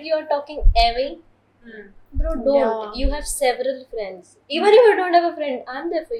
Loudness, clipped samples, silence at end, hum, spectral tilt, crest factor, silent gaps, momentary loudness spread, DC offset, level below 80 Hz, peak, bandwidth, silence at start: -20 LUFS; under 0.1%; 0 s; none; -4.5 dB/octave; 18 dB; none; 15 LU; under 0.1%; -28 dBFS; -2 dBFS; 13.5 kHz; 0 s